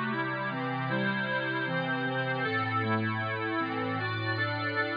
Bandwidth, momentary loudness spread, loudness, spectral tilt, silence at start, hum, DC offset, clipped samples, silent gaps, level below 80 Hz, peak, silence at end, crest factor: 5.2 kHz; 2 LU; -30 LUFS; -8.5 dB/octave; 0 s; none; under 0.1%; under 0.1%; none; -74 dBFS; -18 dBFS; 0 s; 12 dB